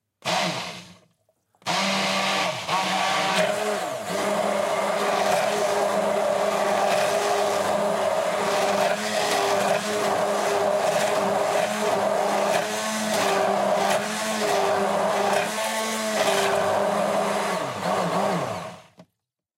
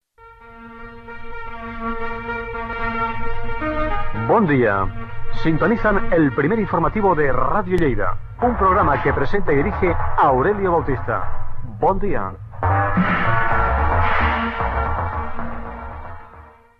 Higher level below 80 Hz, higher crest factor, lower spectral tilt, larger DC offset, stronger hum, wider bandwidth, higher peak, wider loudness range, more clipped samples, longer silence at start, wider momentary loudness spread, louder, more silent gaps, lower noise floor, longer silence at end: second, -70 dBFS vs -28 dBFS; about the same, 16 dB vs 14 dB; second, -3 dB/octave vs -9 dB/octave; neither; neither; first, 16 kHz vs 4.8 kHz; second, -8 dBFS vs -4 dBFS; second, 1 LU vs 6 LU; neither; about the same, 0.25 s vs 0.25 s; second, 4 LU vs 16 LU; second, -23 LUFS vs -20 LUFS; neither; first, -80 dBFS vs -45 dBFS; first, 0.55 s vs 0.35 s